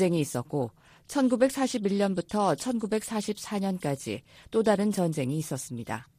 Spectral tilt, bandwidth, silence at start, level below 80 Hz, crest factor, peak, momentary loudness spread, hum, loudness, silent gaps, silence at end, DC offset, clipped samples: -5.5 dB/octave; 15.5 kHz; 0 s; -64 dBFS; 20 dB; -8 dBFS; 10 LU; none; -29 LUFS; none; 0.15 s; under 0.1%; under 0.1%